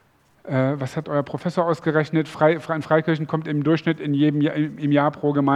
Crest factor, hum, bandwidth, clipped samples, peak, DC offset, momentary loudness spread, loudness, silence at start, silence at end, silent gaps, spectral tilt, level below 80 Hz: 18 dB; none; 10.5 kHz; under 0.1%; -4 dBFS; under 0.1%; 5 LU; -22 LUFS; 0.45 s; 0 s; none; -8 dB/octave; -64 dBFS